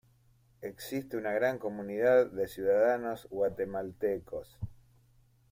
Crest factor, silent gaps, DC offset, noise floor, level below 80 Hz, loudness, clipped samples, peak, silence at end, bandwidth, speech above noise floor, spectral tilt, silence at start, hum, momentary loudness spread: 18 dB; none; under 0.1%; -66 dBFS; -62 dBFS; -31 LUFS; under 0.1%; -14 dBFS; 0.8 s; 16 kHz; 35 dB; -6 dB/octave; 0.6 s; none; 18 LU